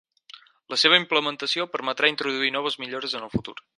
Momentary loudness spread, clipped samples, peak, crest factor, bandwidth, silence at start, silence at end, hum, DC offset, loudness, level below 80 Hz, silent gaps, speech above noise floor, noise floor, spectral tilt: 12 LU; under 0.1%; -2 dBFS; 24 dB; 11.5 kHz; 0.35 s; 0.15 s; none; under 0.1%; -23 LUFS; -56 dBFS; none; 25 dB; -50 dBFS; -3 dB/octave